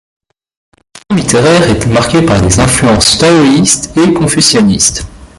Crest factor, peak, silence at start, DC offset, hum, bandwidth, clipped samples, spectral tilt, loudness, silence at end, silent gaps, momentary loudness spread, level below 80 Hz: 8 dB; 0 dBFS; 1.1 s; under 0.1%; none; 16 kHz; 0.1%; -4 dB/octave; -7 LUFS; 0.1 s; none; 4 LU; -28 dBFS